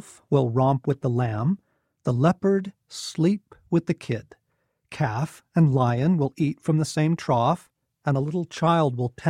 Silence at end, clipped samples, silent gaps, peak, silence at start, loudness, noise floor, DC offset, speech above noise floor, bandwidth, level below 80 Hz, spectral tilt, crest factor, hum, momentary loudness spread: 0 s; under 0.1%; none; -6 dBFS; 0.3 s; -24 LUFS; -73 dBFS; under 0.1%; 50 dB; 12 kHz; -58 dBFS; -7.5 dB/octave; 18 dB; none; 11 LU